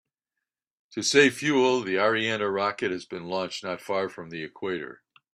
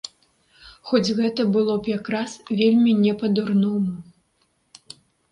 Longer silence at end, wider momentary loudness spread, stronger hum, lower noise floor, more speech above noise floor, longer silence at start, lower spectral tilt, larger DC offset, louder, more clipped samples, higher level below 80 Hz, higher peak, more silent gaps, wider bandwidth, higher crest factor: second, 0.4 s vs 1.3 s; first, 15 LU vs 11 LU; neither; first, -87 dBFS vs -67 dBFS; first, 61 dB vs 47 dB; first, 0.9 s vs 0.65 s; second, -3.5 dB/octave vs -6.5 dB/octave; neither; second, -26 LUFS vs -21 LUFS; neither; second, -72 dBFS vs -62 dBFS; about the same, -6 dBFS vs -6 dBFS; neither; first, 14 kHz vs 10.5 kHz; about the same, 22 dB vs 18 dB